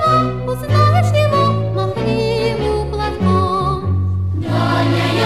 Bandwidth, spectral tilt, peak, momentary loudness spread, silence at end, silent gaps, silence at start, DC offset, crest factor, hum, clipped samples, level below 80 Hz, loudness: 13 kHz; -7 dB/octave; -2 dBFS; 6 LU; 0 s; none; 0 s; 1%; 14 dB; none; under 0.1%; -32 dBFS; -16 LUFS